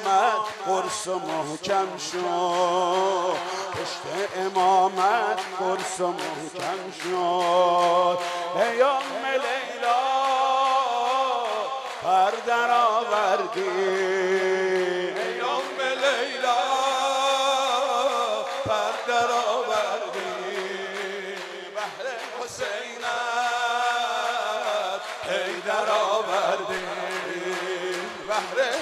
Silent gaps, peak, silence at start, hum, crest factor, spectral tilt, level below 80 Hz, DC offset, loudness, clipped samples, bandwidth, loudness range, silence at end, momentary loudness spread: none; -8 dBFS; 0 s; none; 18 dB; -2.5 dB/octave; -70 dBFS; under 0.1%; -25 LUFS; under 0.1%; 14.5 kHz; 4 LU; 0 s; 9 LU